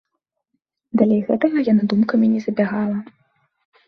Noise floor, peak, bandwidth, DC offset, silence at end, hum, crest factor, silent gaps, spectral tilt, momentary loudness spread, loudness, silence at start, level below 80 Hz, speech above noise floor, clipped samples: -77 dBFS; -4 dBFS; 6 kHz; under 0.1%; 0.85 s; none; 16 dB; none; -9 dB/octave; 8 LU; -19 LUFS; 0.95 s; -62 dBFS; 60 dB; under 0.1%